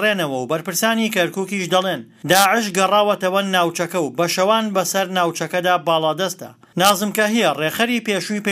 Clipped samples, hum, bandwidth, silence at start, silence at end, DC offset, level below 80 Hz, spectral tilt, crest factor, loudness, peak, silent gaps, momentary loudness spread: under 0.1%; none; 16 kHz; 0 s; 0 s; under 0.1%; -66 dBFS; -3.5 dB/octave; 18 dB; -18 LUFS; 0 dBFS; none; 6 LU